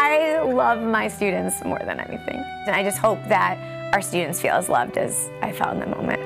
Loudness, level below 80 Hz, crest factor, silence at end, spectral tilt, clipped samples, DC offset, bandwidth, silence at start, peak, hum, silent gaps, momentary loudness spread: -22 LUFS; -56 dBFS; 16 dB; 0 s; -4 dB/octave; under 0.1%; under 0.1%; 16 kHz; 0 s; -6 dBFS; none; none; 9 LU